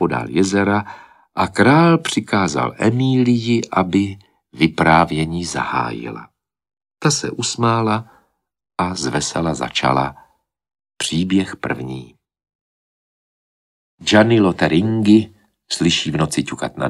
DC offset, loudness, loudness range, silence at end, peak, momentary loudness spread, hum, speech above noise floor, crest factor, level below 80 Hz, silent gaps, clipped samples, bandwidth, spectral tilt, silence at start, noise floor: under 0.1%; -17 LUFS; 6 LU; 0 s; 0 dBFS; 12 LU; none; 42 dB; 18 dB; -48 dBFS; 12.55-13.98 s; under 0.1%; 12.5 kHz; -5 dB/octave; 0 s; -59 dBFS